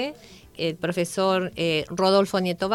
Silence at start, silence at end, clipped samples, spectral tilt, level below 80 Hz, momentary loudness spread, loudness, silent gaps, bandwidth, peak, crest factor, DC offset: 0 s; 0 s; under 0.1%; -5 dB/octave; -56 dBFS; 9 LU; -24 LUFS; none; 16 kHz; -8 dBFS; 16 dB; under 0.1%